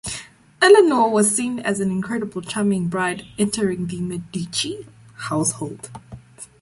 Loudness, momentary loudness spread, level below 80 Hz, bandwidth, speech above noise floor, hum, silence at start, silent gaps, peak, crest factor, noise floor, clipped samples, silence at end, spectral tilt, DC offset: -20 LUFS; 21 LU; -54 dBFS; 12 kHz; 21 dB; none; 0.05 s; none; -2 dBFS; 20 dB; -41 dBFS; under 0.1%; 0.15 s; -4 dB/octave; under 0.1%